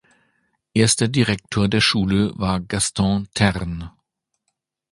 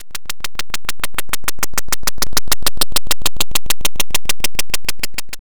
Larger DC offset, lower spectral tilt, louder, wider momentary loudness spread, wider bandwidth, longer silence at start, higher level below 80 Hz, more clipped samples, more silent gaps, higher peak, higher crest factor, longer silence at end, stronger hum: second, under 0.1% vs 30%; first, -4.5 dB/octave vs -1 dB/octave; about the same, -20 LUFS vs -20 LUFS; first, 10 LU vs 7 LU; second, 11.5 kHz vs over 20 kHz; first, 0.75 s vs 0 s; second, -40 dBFS vs -34 dBFS; neither; neither; first, 0 dBFS vs -4 dBFS; about the same, 20 dB vs 18 dB; first, 1 s vs 0 s; neither